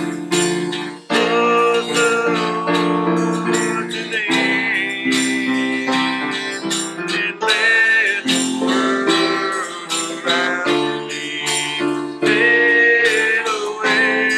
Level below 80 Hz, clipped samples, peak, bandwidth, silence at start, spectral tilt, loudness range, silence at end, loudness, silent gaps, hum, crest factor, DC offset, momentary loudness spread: -68 dBFS; under 0.1%; -4 dBFS; 15.5 kHz; 0 s; -3 dB/octave; 3 LU; 0 s; -17 LUFS; none; none; 14 dB; under 0.1%; 9 LU